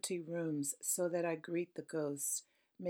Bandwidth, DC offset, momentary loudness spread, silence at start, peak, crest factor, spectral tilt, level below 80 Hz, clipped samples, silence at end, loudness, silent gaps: 19 kHz; under 0.1%; 5 LU; 0.05 s; -24 dBFS; 16 dB; -4 dB/octave; under -90 dBFS; under 0.1%; 0 s; -39 LUFS; none